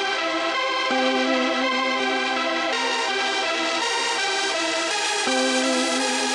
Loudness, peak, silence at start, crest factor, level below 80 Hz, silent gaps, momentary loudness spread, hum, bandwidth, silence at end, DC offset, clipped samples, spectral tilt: -21 LUFS; -10 dBFS; 0 s; 14 dB; -70 dBFS; none; 2 LU; none; 11.5 kHz; 0 s; under 0.1%; under 0.1%; 0 dB/octave